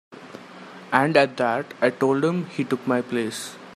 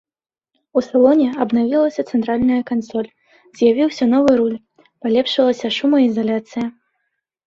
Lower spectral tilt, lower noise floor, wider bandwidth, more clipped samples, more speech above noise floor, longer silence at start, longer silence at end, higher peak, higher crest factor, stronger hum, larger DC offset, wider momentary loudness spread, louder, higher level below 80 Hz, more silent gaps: about the same, -5.5 dB/octave vs -6 dB/octave; second, -42 dBFS vs -81 dBFS; first, 14 kHz vs 7.4 kHz; neither; second, 20 dB vs 65 dB; second, 0.1 s vs 0.75 s; second, 0 s vs 0.75 s; about the same, -2 dBFS vs -2 dBFS; first, 22 dB vs 16 dB; neither; neither; first, 22 LU vs 12 LU; second, -23 LUFS vs -17 LUFS; second, -70 dBFS vs -56 dBFS; neither